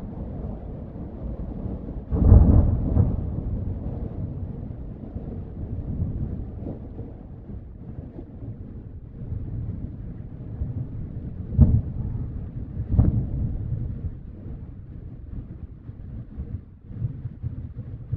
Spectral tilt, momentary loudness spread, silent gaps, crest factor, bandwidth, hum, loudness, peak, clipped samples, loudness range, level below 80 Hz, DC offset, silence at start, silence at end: -14 dB/octave; 19 LU; none; 26 dB; 2.2 kHz; none; -27 LUFS; 0 dBFS; under 0.1%; 14 LU; -30 dBFS; under 0.1%; 0 s; 0 s